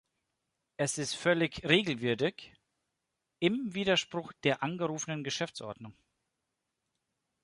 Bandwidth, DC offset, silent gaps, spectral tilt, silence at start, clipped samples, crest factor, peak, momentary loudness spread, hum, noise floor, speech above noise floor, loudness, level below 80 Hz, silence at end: 11.5 kHz; under 0.1%; none; -4 dB/octave; 0.8 s; under 0.1%; 24 dB; -10 dBFS; 16 LU; none; -85 dBFS; 53 dB; -31 LUFS; -68 dBFS; 1.55 s